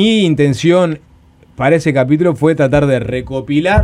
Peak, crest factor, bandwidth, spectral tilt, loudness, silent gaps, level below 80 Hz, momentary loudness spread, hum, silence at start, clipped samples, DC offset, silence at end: 0 dBFS; 12 dB; 11.5 kHz; -6.5 dB/octave; -13 LUFS; none; -34 dBFS; 7 LU; none; 0 s; under 0.1%; under 0.1%; 0 s